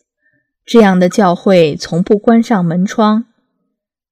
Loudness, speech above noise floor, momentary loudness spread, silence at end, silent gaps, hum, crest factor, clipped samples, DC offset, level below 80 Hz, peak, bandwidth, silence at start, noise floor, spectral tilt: -11 LUFS; 61 dB; 5 LU; 0.9 s; none; none; 12 dB; 0.8%; under 0.1%; -50 dBFS; 0 dBFS; 11.5 kHz; 0.7 s; -72 dBFS; -6.5 dB/octave